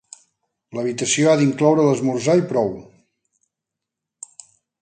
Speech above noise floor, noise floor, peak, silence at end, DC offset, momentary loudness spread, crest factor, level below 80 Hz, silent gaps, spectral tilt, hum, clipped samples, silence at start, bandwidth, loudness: 66 dB; -84 dBFS; -4 dBFS; 2 s; under 0.1%; 23 LU; 18 dB; -62 dBFS; none; -5 dB/octave; none; under 0.1%; 0.75 s; 9.6 kHz; -18 LUFS